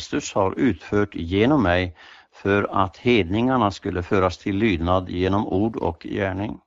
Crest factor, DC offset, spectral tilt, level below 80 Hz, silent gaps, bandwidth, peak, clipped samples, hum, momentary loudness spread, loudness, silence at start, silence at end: 18 dB; under 0.1%; -6.5 dB/octave; -44 dBFS; none; 7.8 kHz; -4 dBFS; under 0.1%; none; 7 LU; -22 LUFS; 0 s; 0.1 s